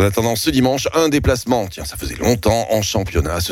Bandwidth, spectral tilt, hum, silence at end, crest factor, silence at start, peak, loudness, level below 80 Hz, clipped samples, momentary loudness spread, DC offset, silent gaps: 17 kHz; -5 dB/octave; none; 0 s; 14 dB; 0 s; -2 dBFS; -18 LUFS; -30 dBFS; under 0.1%; 5 LU; under 0.1%; none